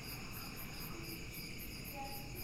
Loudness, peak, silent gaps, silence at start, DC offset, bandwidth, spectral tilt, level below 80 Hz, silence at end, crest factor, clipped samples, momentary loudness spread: -46 LUFS; -32 dBFS; none; 0 s; under 0.1%; 16 kHz; -3.5 dB/octave; -54 dBFS; 0 s; 14 dB; under 0.1%; 1 LU